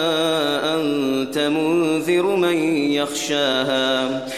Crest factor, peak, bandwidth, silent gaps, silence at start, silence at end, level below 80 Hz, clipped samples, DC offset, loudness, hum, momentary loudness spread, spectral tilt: 12 dB; -6 dBFS; 15.5 kHz; none; 0 s; 0 s; -64 dBFS; under 0.1%; 0.2%; -19 LUFS; none; 3 LU; -4 dB/octave